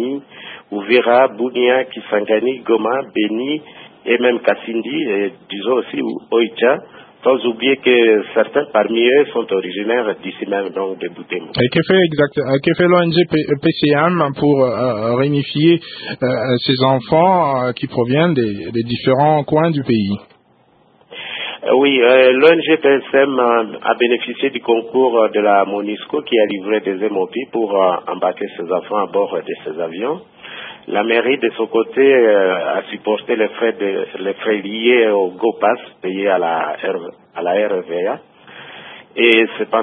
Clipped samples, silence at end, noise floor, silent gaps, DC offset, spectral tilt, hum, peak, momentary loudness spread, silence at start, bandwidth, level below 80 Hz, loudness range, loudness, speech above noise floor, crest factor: under 0.1%; 0 s; -54 dBFS; none; under 0.1%; -9 dB/octave; none; 0 dBFS; 11 LU; 0 s; 4.8 kHz; -58 dBFS; 5 LU; -16 LUFS; 38 dB; 16 dB